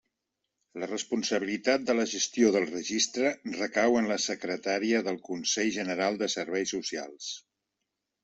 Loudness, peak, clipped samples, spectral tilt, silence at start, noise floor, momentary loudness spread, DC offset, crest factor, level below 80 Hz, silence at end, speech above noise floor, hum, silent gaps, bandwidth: -29 LUFS; -10 dBFS; under 0.1%; -2.5 dB/octave; 0.75 s; -85 dBFS; 10 LU; under 0.1%; 20 dB; -72 dBFS; 0.85 s; 56 dB; none; none; 8.2 kHz